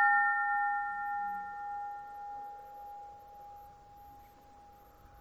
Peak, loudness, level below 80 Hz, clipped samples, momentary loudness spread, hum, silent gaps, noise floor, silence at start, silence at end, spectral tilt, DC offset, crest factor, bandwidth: -18 dBFS; -34 LUFS; -68 dBFS; under 0.1%; 26 LU; none; none; -57 dBFS; 0 s; 0 s; -4 dB/octave; under 0.1%; 20 dB; 13.5 kHz